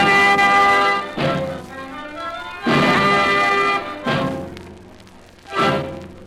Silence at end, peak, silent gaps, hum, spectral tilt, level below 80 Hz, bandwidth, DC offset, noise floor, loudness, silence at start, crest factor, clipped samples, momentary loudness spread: 0 s; -6 dBFS; none; none; -4.5 dB/octave; -48 dBFS; 15.5 kHz; under 0.1%; -44 dBFS; -17 LUFS; 0 s; 14 dB; under 0.1%; 18 LU